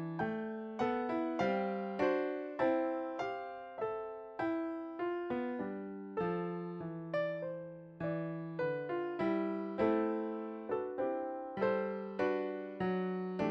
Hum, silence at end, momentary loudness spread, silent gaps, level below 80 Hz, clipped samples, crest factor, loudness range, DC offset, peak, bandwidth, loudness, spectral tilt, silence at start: none; 0 s; 8 LU; none; -72 dBFS; under 0.1%; 16 dB; 4 LU; under 0.1%; -20 dBFS; 7 kHz; -37 LUFS; -8 dB/octave; 0 s